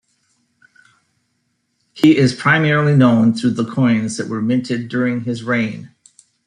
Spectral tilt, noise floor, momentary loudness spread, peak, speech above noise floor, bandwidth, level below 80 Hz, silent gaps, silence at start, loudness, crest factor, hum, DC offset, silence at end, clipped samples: -6.5 dB/octave; -68 dBFS; 9 LU; -2 dBFS; 53 dB; 10.5 kHz; -58 dBFS; none; 1.95 s; -16 LUFS; 16 dB; none; under 0.1%; 0.6 s; under 0.1%